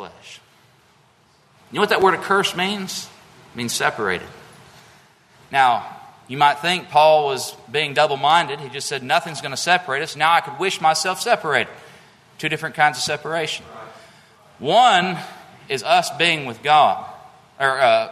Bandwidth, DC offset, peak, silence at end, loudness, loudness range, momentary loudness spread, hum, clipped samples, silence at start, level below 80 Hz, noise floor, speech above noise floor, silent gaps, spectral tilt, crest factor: 13.5 kHz; under 0.1%; 0 dBFS; 0 s; -19 LUFS; 5 LU; 14 LU; none; under 0.1%; 0 s; -64 dBFS; -56 dBFS; 37 dB; none; -3 dB/octave; 20 dB